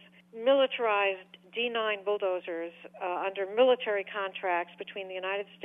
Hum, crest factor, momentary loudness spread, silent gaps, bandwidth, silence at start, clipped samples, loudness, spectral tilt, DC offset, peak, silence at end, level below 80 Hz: none; 16 dB; 14 LU; none; 3.8 kHz; 0.35 s; under 0.1%; -30 LUFS; -5.5 dB/octave; under 0.1%; -14 dBFS; 0 s; -88 dBFS